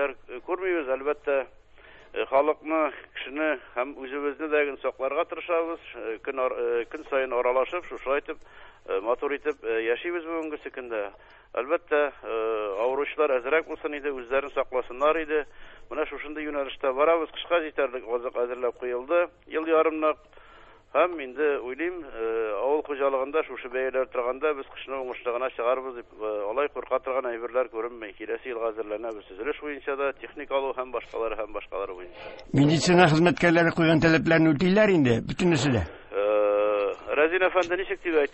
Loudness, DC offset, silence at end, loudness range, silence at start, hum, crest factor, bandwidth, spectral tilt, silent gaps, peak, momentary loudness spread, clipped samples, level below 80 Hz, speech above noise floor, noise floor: -27 LUFS; under 0.1%; 0 s; 9 LU; 0 s; none; 22 dB; 8.6 kHz; -6 dB/octave; none; -6 dBFS; 13 LU; under 0.1%; -54 dBFS; 25 dB; -52 dBFS